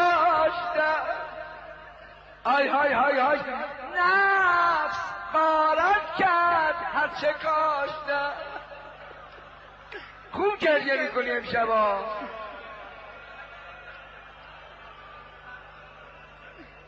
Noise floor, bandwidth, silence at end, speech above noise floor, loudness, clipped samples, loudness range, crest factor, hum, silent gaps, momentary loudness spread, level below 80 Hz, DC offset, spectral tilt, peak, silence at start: -48 dBFS; 7.8 kHz; 0.05 s; 22 dB; -24 LUFS; under 0.1%; 20 LU; 14 dB; none; none; 24 LU; -58 dBFS; under 0.1%; -4.5 dB/octave; -12 dBFS; 0 s